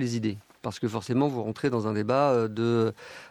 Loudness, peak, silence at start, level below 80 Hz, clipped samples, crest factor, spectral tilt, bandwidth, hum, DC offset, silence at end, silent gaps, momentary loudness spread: -27 LUFS; -10 dBFS; 0 s; -70 dBFS; under 0.1%; 16 dB; -7 dB/octave; 13.5 kHz; none; under 0.1%; 0 s; none; 10 LU